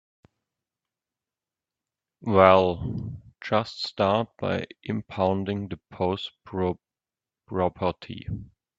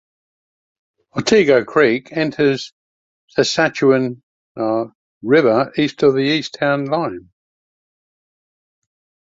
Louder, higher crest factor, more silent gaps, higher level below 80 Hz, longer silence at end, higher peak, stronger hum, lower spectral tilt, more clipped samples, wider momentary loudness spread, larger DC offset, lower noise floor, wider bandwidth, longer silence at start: second, -26 LUFS vs -17 LUFS; first, 26 dB vs 18 dB; second, none vs 2.72-3.28 s, 4.23-4.55 s, 4.95-5.21 s; about the same, -56 dBFS vs -58 dBFS; second, 0.35 s vs 2.15 s; about the same, 0 dBFS vs -2 dBFS; neither; first, -7.5 dB/octave vs -5 dB/octave; neither; first, 18 LU vs 13 LU; neither; about the same, under -90 dBFS vs under -90 dBFS; about the same, 7.8 kHz vs 7.8 kHz; first, 2.2 s vs 1.15 s